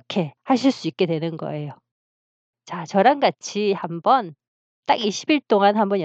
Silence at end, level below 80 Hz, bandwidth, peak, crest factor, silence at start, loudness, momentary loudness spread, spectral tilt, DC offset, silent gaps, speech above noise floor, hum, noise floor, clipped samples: 0 s; -78 dBFS; 8.2 kHz; -2 dBFS; 20 dB; 0.1 s; -21 LUFS; 15 LU; -5.5 dB/octave; under 0.1%; 1.91-2.53 s, 4.48-4.83 s; over 69 dB; none; under -90 dBFS; under 0.1%